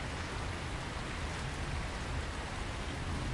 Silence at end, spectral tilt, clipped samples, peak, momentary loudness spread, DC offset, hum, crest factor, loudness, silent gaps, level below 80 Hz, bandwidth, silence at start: 0 s; -4.5 dB/octave; under 0.1%; -26 dBFS; 1 LU; under 0.1%; none; 12 dB; -39 LUFS; none; -44 dBFS; 11.5 kHz; 0 s